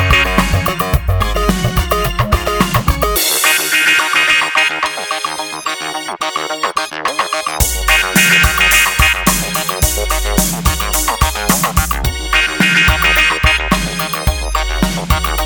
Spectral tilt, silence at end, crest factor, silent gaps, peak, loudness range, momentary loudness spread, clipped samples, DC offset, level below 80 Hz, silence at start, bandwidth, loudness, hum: -3 dB/octave; 0 s; 14 dB; none; 0 dBFS; 4 LU; 9 LU; under 0.1%; under 0.1%; -22 dBFS; 0 s; 19.5 kHz; -13 LUFS; none